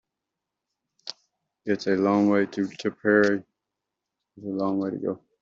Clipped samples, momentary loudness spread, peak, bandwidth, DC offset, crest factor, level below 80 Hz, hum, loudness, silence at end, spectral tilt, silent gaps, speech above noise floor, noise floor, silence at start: under 0.1%; 19 LU; -6 dBFS; 7.4 kHz; under 0.1%; 20 dB; -70 dBFS; none; -25 LUFS; 0.25 s; -6.5 dB/octave; none; 62 dB; -85 dBFS; 1.05 s